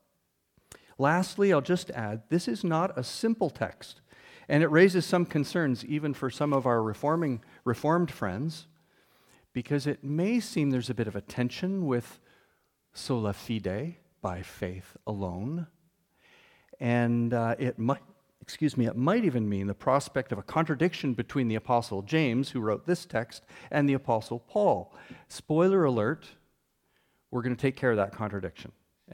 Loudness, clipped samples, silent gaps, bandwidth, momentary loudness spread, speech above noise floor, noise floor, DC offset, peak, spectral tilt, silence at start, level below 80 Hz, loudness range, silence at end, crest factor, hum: -29 LUFS; under 0.1%; none; 16.5 kHz; 12 LU; 47 dB; -76 dBFS; under 0.1%; -8 dBFS; -6.5 dB/octave; 1 s; -64 dBFS; 7 LU; 0.45 s; 22 dB; none